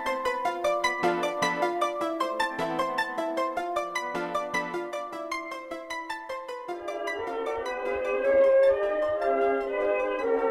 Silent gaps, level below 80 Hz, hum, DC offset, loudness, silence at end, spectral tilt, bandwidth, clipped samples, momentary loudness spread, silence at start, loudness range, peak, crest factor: none; -60 dBFS; none; under 0.1%; -28 LUFS; 0 s; -3.5 dB/octave; 15 kHz; under 0.1%; 11 LU; 0 s; 8 LU; -10 dBFS; 18 dB